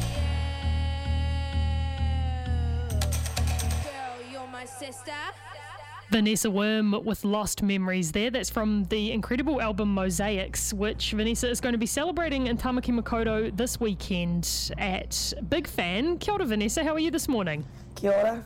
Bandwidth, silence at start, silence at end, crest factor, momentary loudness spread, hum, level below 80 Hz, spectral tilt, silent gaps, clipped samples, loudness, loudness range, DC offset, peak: 16.5 kHz; 0 s; 0 s; 18 dB; 10 LU; none; -36 dBFS; -4.5 dB/octave; none; under 0.1%; -28 LUFS; 4 LU; under 0.1%; -8 dBFS